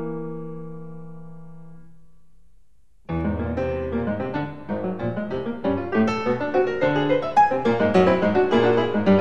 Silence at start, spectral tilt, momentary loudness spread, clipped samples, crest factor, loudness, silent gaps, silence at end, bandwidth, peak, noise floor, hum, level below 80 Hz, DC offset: 0 s; -7.5 dB/octave; 18 LU; under 0.1%; 18 dB; -22 LUFS; none; 0 s; 8.4 kHz; -4 dBFS; -59 dBFS; none; -46 dBFS; 1%